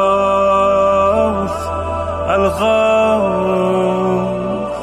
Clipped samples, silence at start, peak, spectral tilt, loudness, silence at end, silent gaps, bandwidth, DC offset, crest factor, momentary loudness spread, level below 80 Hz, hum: under 0.1%; 0 s; -4 dBFS; -6.5 dB/octave; -15 LUFS; 0 s; none; 14 kHz; under 0.1%; 12 dB; 8 LU; -36 dBFS; none